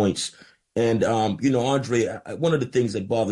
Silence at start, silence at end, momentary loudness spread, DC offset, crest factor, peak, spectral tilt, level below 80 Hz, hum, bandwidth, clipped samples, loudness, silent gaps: 0 s; 0 s; 7 LU; under 0.1%; 14 dB; -10 dBFS; -5.5 dB/octave; -60 dBFS; none; 11.5 kHz; under 0.1%; -24 LUFS; none